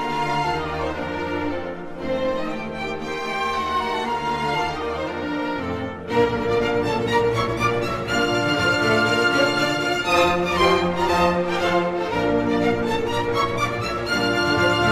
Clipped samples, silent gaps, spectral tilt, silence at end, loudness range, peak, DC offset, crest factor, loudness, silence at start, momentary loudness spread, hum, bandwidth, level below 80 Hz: under 0.1%; none; -5 dB/octave; 0 s; 6 LU; -4 dBFS; under 0.1%; 18 dB; -22 LUFS; 0 s; 8 LU; none; 15.5 kHz; -44 dBFS